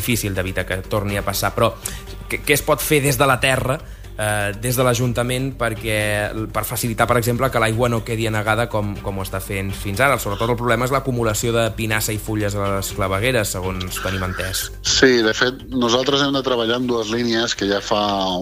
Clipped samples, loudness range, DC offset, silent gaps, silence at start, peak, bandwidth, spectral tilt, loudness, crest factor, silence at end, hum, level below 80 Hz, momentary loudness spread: under 0.1%; 3 LU; under 0.1%; none; 0 s; -2 dBFS; 16 kHz; -4 dB/octave; -19 LUFS; 18 dB; 0 s; none; -36 dBFS; 8 LU